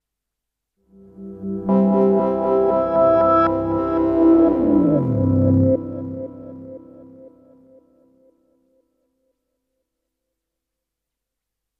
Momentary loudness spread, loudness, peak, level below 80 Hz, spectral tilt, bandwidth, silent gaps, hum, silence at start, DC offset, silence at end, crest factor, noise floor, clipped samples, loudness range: 20 LU; -17 LUFS; -6 dBFS; -48 dBFS; -11.5 dB/octave; 5.2 kHz; none; none; 1.2 s; under 0.1%; 4.5 s; 16 dB; -82 dBFS; under 0.1%; 9 LU